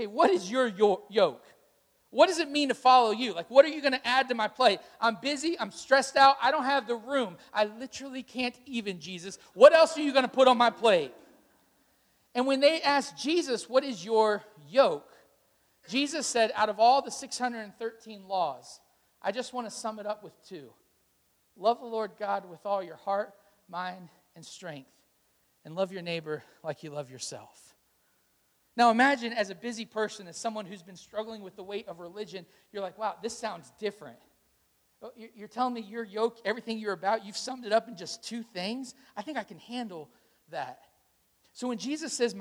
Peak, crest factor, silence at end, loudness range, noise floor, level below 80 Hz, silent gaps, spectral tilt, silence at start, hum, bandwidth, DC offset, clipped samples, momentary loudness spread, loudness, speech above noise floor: -4 dBFS; 26 dB; 0 s; 14 LU; -71 dBFS; -78 dBFS; none; -3 dB/octave; 0 s; none; 15.5 kHz; under 0.1%; under 0.1%; 19 LU; -28 LUFS; 42 dB